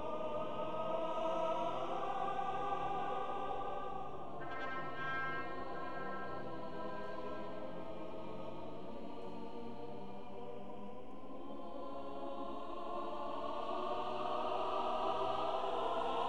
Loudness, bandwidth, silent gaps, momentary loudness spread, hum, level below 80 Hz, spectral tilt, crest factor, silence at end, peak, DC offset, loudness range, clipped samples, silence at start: -42 LUFS; 11.5 kHz; none; 11 LU; none; -64 dBFS; -6 dB/octave; 16 dB; 0 s; -24 dBFS; 0.7%; 9 LU; under 0.1%; 0 s